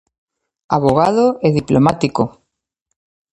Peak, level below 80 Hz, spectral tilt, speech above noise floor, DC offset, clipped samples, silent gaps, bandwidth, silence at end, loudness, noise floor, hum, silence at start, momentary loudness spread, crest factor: 0 dBFS; -46 dBFS; -7.5 dB/octave; 60 dB; under 0.1%; under 0.1%; none; 11.5 kHz; 1.05 s; -15 LUFS; -75 dBFS; none; 0.7 s; 7 LU; 16 dB